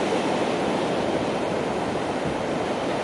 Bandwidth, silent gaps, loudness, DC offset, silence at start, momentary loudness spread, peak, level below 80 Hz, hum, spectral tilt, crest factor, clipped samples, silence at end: 11.5 kHz; none; -25 LUFS; under 0.1%; 0 s; 3 LU; -12 dBFS; -52 dBFS; none; -5 dB/octave; 14 dB; under 0.1%; 0 s